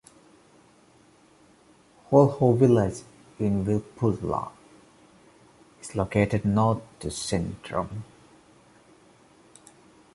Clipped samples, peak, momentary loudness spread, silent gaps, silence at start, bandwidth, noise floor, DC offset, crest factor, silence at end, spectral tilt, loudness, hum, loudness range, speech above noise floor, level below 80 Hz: under 0.1%; -4 dBFS; 15 LU; none; 2.1 s; 11.5 kHz; -58 dBFS; under 0.1%; 24 dB; 2.1 s; -7 dB/octave; -25 LUFS; none; 7 LU; 34 dB; -50 dBFS